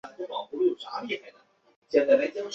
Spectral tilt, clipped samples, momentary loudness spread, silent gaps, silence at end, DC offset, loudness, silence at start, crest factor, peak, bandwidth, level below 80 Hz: -4.5 dB/octave; under 0.1%; 13 LU; 1.76-1.82 s; 0 s; under 0.1%; -27 LUFS; 0.05 s; 20 dB; -8 dBFS; 7.6 kHz; -74 dBFS